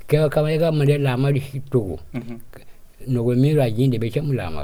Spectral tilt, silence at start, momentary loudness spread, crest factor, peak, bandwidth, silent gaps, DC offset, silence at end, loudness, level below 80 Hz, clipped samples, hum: -8 dB/octave; 0 s; 15 LU; 16 dB; -4 dBFS; 15.5 kHz; none; under 0.1%; 0 s; -20 LUFS; -44 dBFS; under 0.1%; none